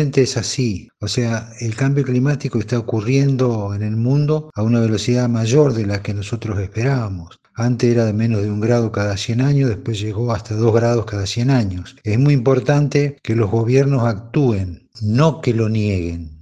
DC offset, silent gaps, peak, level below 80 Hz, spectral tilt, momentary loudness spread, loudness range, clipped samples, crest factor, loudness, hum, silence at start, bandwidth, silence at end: under 0.1%; none; 0 dBFS; -40 dBFS; -7 dB/octave; 8 LU; 2 LU; under 0.1%; 16 dB; -18 LUFS; none; 0 s; 9.4 kHz; 0.05 s